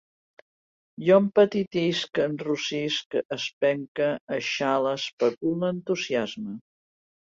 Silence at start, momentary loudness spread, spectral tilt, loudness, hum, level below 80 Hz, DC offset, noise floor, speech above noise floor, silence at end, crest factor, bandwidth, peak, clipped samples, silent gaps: 1 s; 9 LU; -5 dB/octave; -25 LUFS; none; -70 dBFS; under 0.1%; under -90 dBFS; over 65 dB; 0.7 s; 18 dB; 7.6 kHz; -8 dBFS; under 0.1%; 3.06-3.11 s, 3.25-3.29 s, 3.53-3.61 s, 3.88-3.95 s, 4.21-4.27 s, 5.13-5.18 s, 5.37-5.41 s